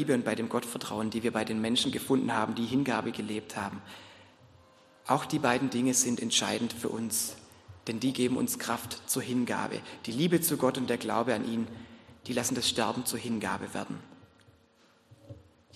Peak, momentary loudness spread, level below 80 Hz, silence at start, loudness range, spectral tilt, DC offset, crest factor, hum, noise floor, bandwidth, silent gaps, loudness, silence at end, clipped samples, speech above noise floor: -10 dBFS; 12 LU; -68 dBFS; 0 s; 4 LU; -3.5 dB/octave; under 0.1%; 22 dB; none; -64 dBFS; 13 kHz; none; -30 LUFS; 0.35 s; under 0.1%; 33 dB